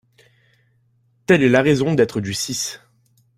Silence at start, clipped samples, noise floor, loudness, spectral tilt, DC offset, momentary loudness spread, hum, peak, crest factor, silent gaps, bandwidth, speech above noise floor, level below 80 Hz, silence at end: 1.3 s; under 0.1%; -61 dBFS; -18 LUFS; -5 dB/octave; under 0.1%; 15 LU; none; -2 dBFS; 18 dB; none; 16 kHz; 44 dB; -54 dBFS; 0.6 s